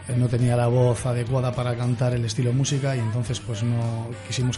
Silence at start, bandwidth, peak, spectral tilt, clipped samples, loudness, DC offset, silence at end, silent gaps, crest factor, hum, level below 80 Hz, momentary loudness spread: 0 s; 11.5 kHz; -10 dBFS; -6 dB/octave; under 0.1%; -24 LUFS; under 0.1%; 0 s; none; 12 dB; none; -48 dBFS; 7 LU